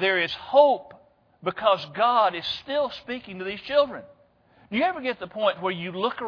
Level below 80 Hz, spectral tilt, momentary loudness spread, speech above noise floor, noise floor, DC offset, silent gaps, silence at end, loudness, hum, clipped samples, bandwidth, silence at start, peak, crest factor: -64 dBFS; -6 dB/octave; 13 LU; 34 dB; -58 dBFS; under 0.1%; none; 0 s; -25 LUFS; none; under 0.1%; 5.4 kHz; 0 s; -6 dBFS; 20 dB